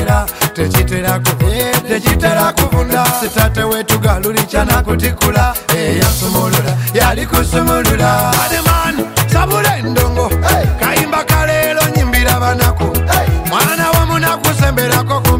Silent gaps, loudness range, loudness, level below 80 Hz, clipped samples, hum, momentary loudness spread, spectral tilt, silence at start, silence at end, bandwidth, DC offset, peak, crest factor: none; 1 LU; -12 LUFS; -20 dBFS; under 0.1%; none; 3 LU; -4.5 dB/octave; 0 s; 0 s; 16.5 kHz; under 0.1%; 0 dBFS; 12 dB